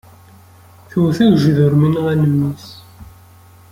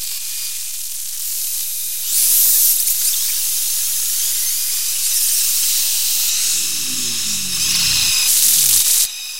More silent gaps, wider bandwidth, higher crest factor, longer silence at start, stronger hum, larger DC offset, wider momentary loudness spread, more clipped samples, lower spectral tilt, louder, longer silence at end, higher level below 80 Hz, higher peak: neither; about the same, 15.5 kHz vs 16.5 kHz; about the same, 14 dB vs 18 dB; first, 0.95 s vs 0 s; neither; second, under 0.1% vs 3%; about the same, 12 LU vs 11 LU; neither; first, -8.5 dB/octave vs 2.5 dB/octave; about the same, -14 LUFS vs -14 LUFS; first, 0.65 s vs 0 s; about the same, -50 dBFS vs -54 dBFS; about the same, -2 dBFS vs 0 dBFS